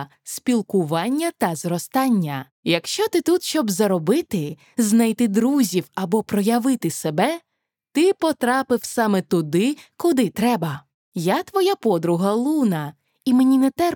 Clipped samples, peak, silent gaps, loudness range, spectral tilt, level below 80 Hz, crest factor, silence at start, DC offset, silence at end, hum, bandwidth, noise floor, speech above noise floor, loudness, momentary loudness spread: under 0.1%; -6 dBFS; 2.51-2.63 s, 10.94-11.12 s; 1 LU; -5 dB/octave; -66 dBFS; 14 dB; 0 s; under 0.1%; 0 s; none; 19 kHz; -51 dBFS; 31 dB; -21 LUFS; 9 LU